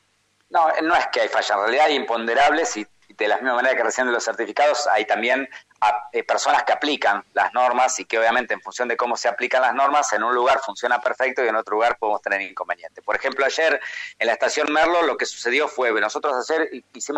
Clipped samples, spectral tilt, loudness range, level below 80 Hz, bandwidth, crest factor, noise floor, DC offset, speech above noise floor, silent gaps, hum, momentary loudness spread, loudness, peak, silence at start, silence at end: under 0.1%; -1 dB/octave; 2 LU; -62 dBFS; 15 kHz; 12 dB; -65 dBFS; under 0.1%; 44 dB; none; none; 7 LU; -21 LUFS; -8 dBFS; 0.5 s; 0 s